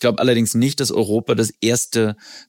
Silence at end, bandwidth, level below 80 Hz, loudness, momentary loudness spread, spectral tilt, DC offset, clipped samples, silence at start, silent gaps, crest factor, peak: 0.1 s; 17 kHz; -62 dBFS; -18 LUFS; 4 LU; -4.5 dB/octave; under 0.1%; under 0.1%; 0 s; none; 14 dB; -4 dBFS